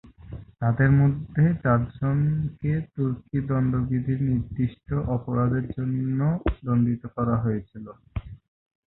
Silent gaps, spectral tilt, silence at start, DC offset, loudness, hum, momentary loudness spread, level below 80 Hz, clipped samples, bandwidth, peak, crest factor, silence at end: none; -13.5 dB/octave; 0.05 s; under 0.1%; -25 LUFS; none; 15 LU; -42 dBFS; under 0.1%; 4 kHz; -8 dBFS; 16 dB; 0.55 s